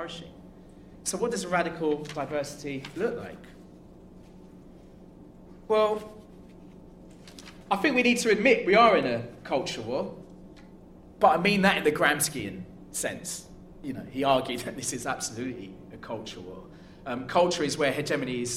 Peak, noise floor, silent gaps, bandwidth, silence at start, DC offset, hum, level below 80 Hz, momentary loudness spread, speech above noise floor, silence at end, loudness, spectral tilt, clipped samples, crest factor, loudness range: -6 dBFS; -50 dBFS; none; 16 kHz; 0 s; under 0.1%; none; -56 dBFS; 21 LU; 23 dB; 0 s; -27 LUFS; -4 dB/octave; under 0.1%; 22 dB; 9 LU